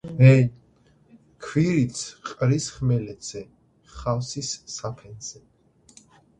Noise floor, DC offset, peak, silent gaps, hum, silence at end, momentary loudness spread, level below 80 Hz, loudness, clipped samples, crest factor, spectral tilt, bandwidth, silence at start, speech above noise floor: -59 dBFS; under 0.1%; -2 dBFS; none; none; 1.1 s; 21 LU; -52 dBFS; -23 LUFS; under 0.1%; 22 dB; -6 dB/octave; 9.6 kHz; 0.05 s; 37 dB